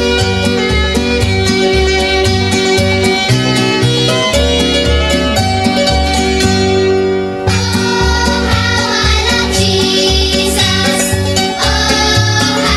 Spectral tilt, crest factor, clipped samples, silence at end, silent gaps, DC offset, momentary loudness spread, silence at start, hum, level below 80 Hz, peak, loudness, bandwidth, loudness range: -4 dB/octave; 12 dB; under 0.1%; 0 s; none; under 0.1%; 2 LU; 0 s; none; -22 dBFS; 0 dBFS; -11 LUFS; 16 kHz; 1 LU